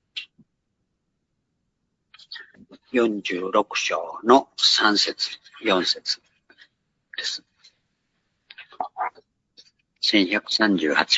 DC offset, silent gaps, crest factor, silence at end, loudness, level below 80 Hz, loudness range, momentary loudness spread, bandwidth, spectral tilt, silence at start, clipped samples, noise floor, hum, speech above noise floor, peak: under 0.1%; none; 24 dB; 0 s; -22 LUFS; -70 dBFS; 14 LU; 18 LU; 8 kHz; -2.5 dB/octave; 0.15 s; under 0.1%; -76 dBFS; none; 54 dB; 0 dBFS